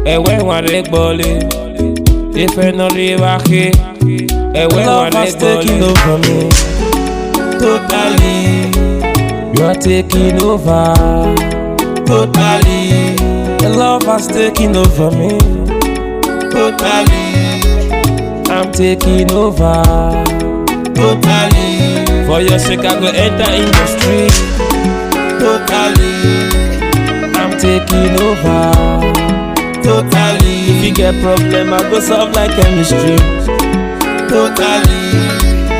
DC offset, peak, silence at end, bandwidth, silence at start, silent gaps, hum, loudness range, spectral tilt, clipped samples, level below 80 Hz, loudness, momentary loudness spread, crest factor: 0.3%; 0 dBFS; 0 s; 16.5 kHz; 0 s; none; none; 2 LU; -5 dB/octave; 0.5%; -16 dBFS; -11 LUFS; 5 LU; 10 dB